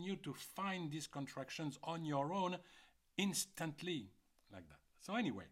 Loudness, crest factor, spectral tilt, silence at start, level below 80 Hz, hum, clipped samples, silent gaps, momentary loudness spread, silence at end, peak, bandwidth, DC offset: -43 LUFS; 18 dB; -4 dB/octave; 0 s; -78 dBFS; none; under 0.1%; none; 19 LU; 0 s; -26 dBFS; 16 kHz; under 0.1%